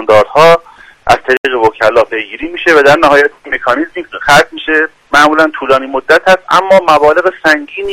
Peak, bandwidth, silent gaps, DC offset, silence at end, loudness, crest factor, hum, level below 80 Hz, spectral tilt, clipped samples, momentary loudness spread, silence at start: 0 dBFS; 16.5 kHz; 1.38-1.44 s; under 0.1%; 0 s; -9 LUFS; 10 dB; none; -40 dBFS; -4 dB/octave; 0.2%; 8 LU; 0 s